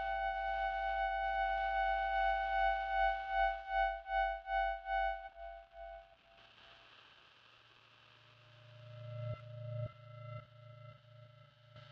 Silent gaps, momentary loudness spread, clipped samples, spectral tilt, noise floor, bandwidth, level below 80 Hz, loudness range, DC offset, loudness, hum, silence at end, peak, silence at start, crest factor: none; 22 LU; under 0.1%; -1.5 dB/octave; -64 dBFS; 6.2 kHz; -56 dBFS; 21 LU; under 0.1%; -37 LUFS; none; 0.05 s; -22 dBFS; 0 s; 16 dB